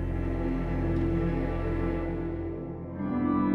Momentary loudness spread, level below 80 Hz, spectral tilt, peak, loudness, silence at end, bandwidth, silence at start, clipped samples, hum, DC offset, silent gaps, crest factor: 7 LU; -36 dBFS; -10 dB/octave; -16 dBFS; -31 LUFS; 0 s; 5.4 kHz; 0 s; under 0.1%; none; under 0.1%; none; 14 dB